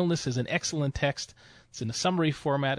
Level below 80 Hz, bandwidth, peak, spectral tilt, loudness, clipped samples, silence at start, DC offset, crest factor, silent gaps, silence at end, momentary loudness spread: -52 dBFS; 10.5 kHz; -12 dBFS; -5 dB/octave; -29 LUFS; under 0.1%; 0 s; under 0.1%; 18 dB; none; 0 s; 11 LU